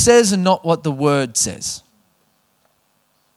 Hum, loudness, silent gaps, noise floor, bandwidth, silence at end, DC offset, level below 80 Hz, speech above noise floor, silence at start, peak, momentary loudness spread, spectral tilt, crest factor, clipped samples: none; -17 LUFS; none; -63 dBFS; 14.5 kHz; 1.6 s; under 0.1%; -50 dBFS; 47 dB; 0 s; 0 dBFS; 14 LU; -4 dB/octave; 18 dB; under 0.1%